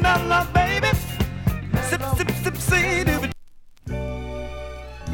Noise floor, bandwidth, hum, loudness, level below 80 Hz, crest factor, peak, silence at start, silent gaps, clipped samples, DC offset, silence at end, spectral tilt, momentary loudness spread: -43 dBFS; 17.5 kHz; none; -22 LUFS; -32 dBFS; 18 dB; -4 dBFS; 0 s; none; under 0.1%; under 0.1%; 0 s; -5 dB/octave; 16 LU